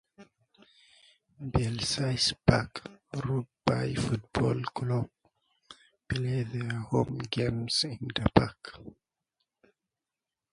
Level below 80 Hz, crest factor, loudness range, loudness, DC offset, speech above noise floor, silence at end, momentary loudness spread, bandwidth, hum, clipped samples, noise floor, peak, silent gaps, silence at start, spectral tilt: -48 dBFS; 28 dB; 3 LU; -30 LUFS; under 0.1%; 60 dB; 1.6 s; 14 LU; 11 kHz; none; under 0.1%; -90 dBFS; -4 dBFS; none; 0.2 s; -5.5 dB/octave